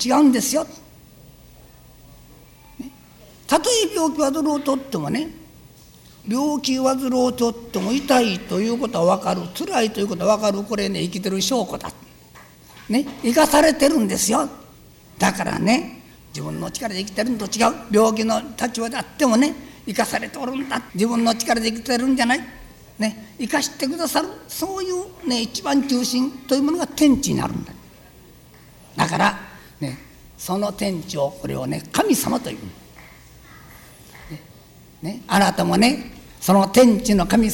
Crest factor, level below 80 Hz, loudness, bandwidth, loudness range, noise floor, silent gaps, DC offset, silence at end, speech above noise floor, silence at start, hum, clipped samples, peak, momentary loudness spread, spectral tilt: 18 dB; -48 dBFS; -20 LUFS; over 20 kHz; 6 LU; -47 dBFS; none; under 0.1%; 0 s; 27 dB; 0 s; none; under 0.1%; -4 dBFS; 15 LU; -4 dB/octave